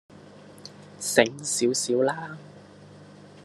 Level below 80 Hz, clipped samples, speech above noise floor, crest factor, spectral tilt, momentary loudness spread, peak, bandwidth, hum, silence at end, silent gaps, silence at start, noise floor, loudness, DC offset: -72 dBFS; under 0.1%; 24 dB; 26 dB; -3 dB/octave; 23 LU; -2 dBFS; 13 kHz; 50 Hz at -50 dBFS; 0 s; none; 0.15 s; -48 dBFS; -24 LUFS; under 0.1%